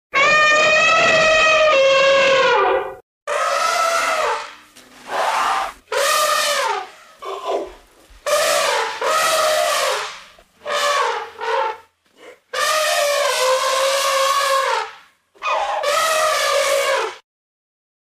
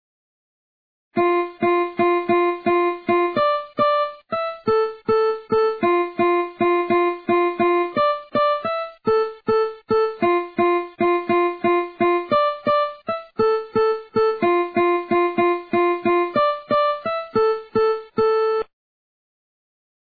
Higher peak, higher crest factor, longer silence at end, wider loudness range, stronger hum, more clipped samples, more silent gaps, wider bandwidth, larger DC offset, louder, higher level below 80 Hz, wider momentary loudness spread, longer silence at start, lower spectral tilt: first, -4 dBFS vs -8 dBFS; about the same, 14 dB vs 12 dB; second, 0.85 s vs 1.55 s; first, 6 LU vs 1 LU; neither; neither; first, 3.03-3.27 s vs none; first, 16 kHz vs 4.8 kHz; neither; first, -17 LUFS vs -20 LUFS; about the same, -56 dBFS vs -58 dBFS; first, 15 LU vs 3 LU; second, 0.15 s vs 1.15 s; second, 0 dB/octave vs -8.5 dB/octave